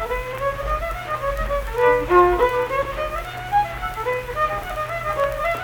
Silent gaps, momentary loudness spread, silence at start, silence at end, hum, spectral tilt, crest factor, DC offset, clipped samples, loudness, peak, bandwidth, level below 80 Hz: none; 10 LU; 0 s; 0 s; none; -6 dB/octave; 18 dB; under 0.1%; under 0.1%; -22 LUFS; -4 dBFS; 19 kHz; -34 dBFS